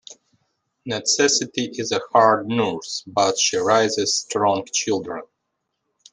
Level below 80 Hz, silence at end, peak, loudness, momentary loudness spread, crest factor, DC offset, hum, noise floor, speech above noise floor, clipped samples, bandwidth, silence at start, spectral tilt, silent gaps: -68 dBFS; 0.9 s; -2 dBFS; -20 LUFS; 11 LU; 20 dB; under 0.1%; none; -77 dBFS; 56 dB; under 0.1%; 10.5 kHz; 0.1 s; -2.5 dB/octave; none